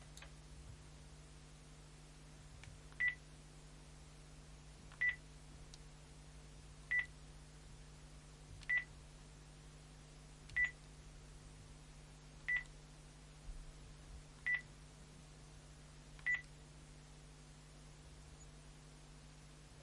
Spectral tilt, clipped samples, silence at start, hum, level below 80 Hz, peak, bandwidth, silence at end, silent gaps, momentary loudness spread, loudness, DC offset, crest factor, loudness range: -3 dB/octave; under 0.1%; 0 s; none; -60 dBFS; -26 dBFS; 11.5 kHz; 0 s; none; 21 LU; -41 LUFS; under 0.1%; 22 dB; 4 LU